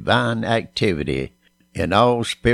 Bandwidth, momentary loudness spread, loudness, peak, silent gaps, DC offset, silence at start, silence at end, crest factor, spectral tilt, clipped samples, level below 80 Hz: 13 kHz; 11 LU; -20 LUFS; -2 dBFS; none; under 0.1%; 0 s; 0 s; 18 dB; -5.5 dB/octave; under 0.1%; -40 dBFS